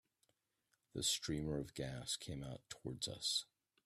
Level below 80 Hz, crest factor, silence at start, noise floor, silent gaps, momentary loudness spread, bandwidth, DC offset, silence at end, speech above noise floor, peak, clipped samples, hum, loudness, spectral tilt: -64 dBFS; 20 dB; 0.95 s; -85 dBFS; none; 12 LU; 15.5 kHz; under 0.1%; 0.4 s; 41 dB; -26 dBFS; under 0.1%; none; -42 LUFS; -3 dB/octave